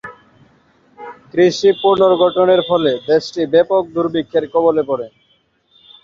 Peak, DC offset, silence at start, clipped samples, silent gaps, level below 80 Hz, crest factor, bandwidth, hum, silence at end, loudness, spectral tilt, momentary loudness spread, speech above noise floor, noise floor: -2 dBFS; under 0.1%; 0.05 s; under 0.1%; none; -58 dBFS; 14 dB; 7.4 kHz; none; 0.95 s; -15 LUFS; -5.5 dB/octave; 17 LU; 45 dB; -59 dBFS